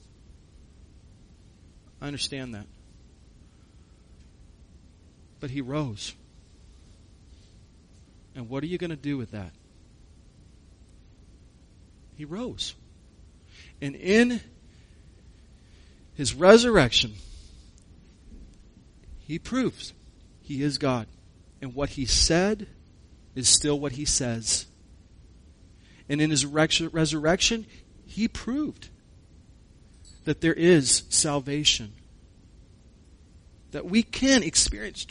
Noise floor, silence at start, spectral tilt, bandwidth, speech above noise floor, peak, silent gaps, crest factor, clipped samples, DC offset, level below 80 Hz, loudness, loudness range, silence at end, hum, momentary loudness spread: -54 dBFS; 2 s; -3.5 dB/octave; 10.5 kHz; 29 dB; -2 dBFS; none; 28 dB; under 0.1%; under 0.1%; -46 dBFS; -24 LUFS; 16 LU; 0.05 s; none; 21 LU